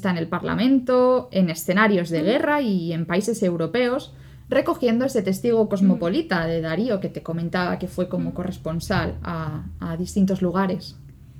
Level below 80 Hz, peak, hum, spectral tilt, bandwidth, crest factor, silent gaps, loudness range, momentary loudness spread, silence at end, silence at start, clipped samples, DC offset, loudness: -46 dBFS; -6 dBFS; none; -6.5 dB/octave; 15.5 kHz; 16 dB; none; 5 LU; 11 LU; 0 s; 0 s; under 0.1%; under 0.1%; -22 LUFS